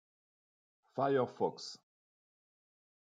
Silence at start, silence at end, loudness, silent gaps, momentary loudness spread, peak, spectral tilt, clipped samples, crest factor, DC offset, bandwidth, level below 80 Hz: 0.95 s; 1.35 s; -36 LUFS; none; 15 LU; -20 dBFS; -5.5 dB/octave; under 0.1%; 20 dB; under 0.1%; 9.2 kHz; -90 dBFS